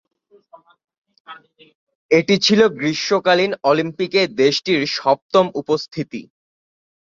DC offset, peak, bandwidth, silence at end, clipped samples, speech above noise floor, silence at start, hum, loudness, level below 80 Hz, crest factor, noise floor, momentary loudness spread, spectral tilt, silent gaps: under 0.1%; -2 dBFS; 7.6 kHz; 0.8 s; under 0.1%; 31 dB; 1.3 s; none; -17 LUFS; -62 dBFS; 18 dB; -49 dBFS; 8 LU; -4.5 dB/octave; 1.75-1.87 s, 1.95-2.09 s, 5.22-5.29 s